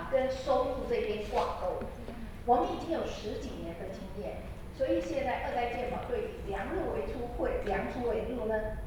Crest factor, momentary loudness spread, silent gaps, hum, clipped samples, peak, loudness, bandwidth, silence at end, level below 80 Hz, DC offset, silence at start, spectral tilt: 18 dB; 10 LU; none; none; under 0.1%; -14 dBFS; -34 LUFS; 19 kHz; 0 s; -44 dBFS; under 0.1%; 0 s; -6 dB/octave